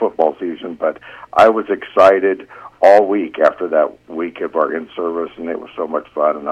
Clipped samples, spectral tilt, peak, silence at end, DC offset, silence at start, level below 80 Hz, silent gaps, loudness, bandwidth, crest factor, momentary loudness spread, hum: under 0.1%; -5.5 dB/octave; 0 dBFS; 0 s; under 0.1%; 0 s; -56 dBFS; none; -16 LUFS; 9.4 kHz; 16 dB; 14 LU; none